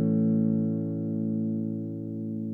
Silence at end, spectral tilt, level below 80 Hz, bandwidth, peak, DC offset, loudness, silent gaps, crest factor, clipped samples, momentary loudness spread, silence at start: 0 s; -14 dB/octave; -76 dBFS; 1.8 kHz; -14 dBFS; under 0.1%; -29 LUFS; none; 12 dB; under 0.1%; 10 LU; 0 s